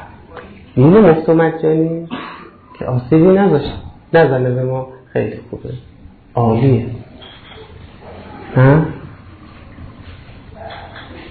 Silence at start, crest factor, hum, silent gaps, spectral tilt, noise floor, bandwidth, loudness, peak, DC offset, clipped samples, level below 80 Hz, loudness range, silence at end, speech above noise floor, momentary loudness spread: 0 s; 14 dB; none; none; -12 dB/octave; -37 dBFS; 4.7 kHz; -14 LUFS; -2 dBFS; under 0.1%; under 0.1%; -40 dBFS; 7 LU; 0 s; 25 dB; 25 LU